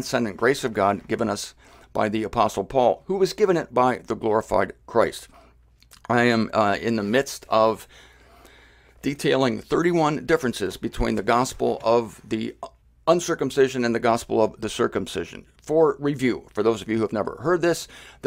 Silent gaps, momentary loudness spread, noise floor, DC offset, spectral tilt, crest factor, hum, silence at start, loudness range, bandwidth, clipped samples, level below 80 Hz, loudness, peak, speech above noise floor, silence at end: none; 9 LU; -55 dBFS; under 0.1%; -5 dB/octave; 20 dB; none; 0 s; 2 LU; 16 kHz; under 0.1%; -46 dBFS; -23 LUFS; -4 dBFS; 32 dB; 0 s